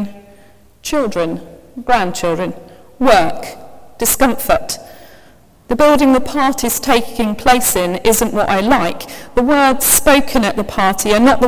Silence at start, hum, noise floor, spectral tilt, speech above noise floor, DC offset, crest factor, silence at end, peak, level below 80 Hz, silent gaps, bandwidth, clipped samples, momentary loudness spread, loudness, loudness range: 0 s; none; -46 dBFS; -3 dB/octave; 33 dB; under 0.1%; 14 dB; 0 s; 0 dBFS; -36 dBFS; none; 16 kHz; under 0.1%; 14 LU; -14 LUFS; 5 LU